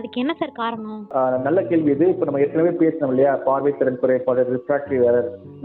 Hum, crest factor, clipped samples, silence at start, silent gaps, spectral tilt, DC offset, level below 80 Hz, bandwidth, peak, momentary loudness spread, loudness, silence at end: none; 14 dB; under 0.1%; 0 s; none; -11 dB/octave; under 0.1%; -62 dBFS; 4.3 kHz; -6 dBFS; 7 LU; -20 LUFS; 0 s